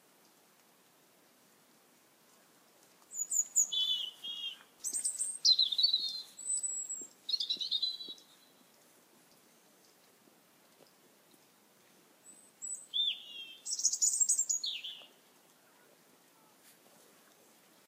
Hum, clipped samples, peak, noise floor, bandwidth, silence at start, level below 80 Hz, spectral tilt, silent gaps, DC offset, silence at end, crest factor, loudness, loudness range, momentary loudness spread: none; under 0.1%; -14 dBFS; -66 dBFS; 16 kHz; 3.1 s; under -90 dBFS; 3.5 dB/octave; none; under 0.1%; 2.8 s; 24 dB; -32 LUFS; 11 LU; 17 LU